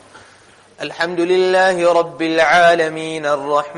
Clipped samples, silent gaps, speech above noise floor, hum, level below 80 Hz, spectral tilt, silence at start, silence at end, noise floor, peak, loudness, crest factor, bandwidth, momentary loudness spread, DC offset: under 0.1%; none; 32 dB; none; -58 dBFS; -4 dB/octave; 0.15 s; 0 s; -47 dBFS; -4 dBFS; -15 LUFS; 12 dB; 11 kHz; 11 LU; under 0.1%